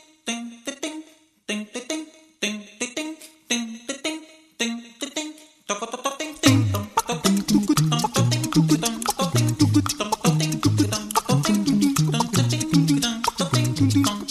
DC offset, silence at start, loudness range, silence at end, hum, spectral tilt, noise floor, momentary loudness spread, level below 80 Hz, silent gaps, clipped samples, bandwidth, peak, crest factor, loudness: under 0.1%; 0.25 s; 9 LU; 0 s; none; -4.5 dB/octave; -46 dBFS; 12 LU; -52 dBFS; none; under 0.1%; 14 kHz; -2 dBFS; 20 dB; -23 LUFS